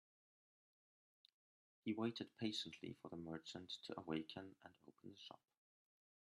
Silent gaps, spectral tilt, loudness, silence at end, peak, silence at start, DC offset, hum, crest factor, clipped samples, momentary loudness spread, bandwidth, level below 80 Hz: none; -5 dB/octave; -49 LUFS; 0.85 s; -32 dBFS; 1.85 s; under 0.1%; none; 22 dB; under 0.1%; 17 LU; 12 kHz; -88 dBFS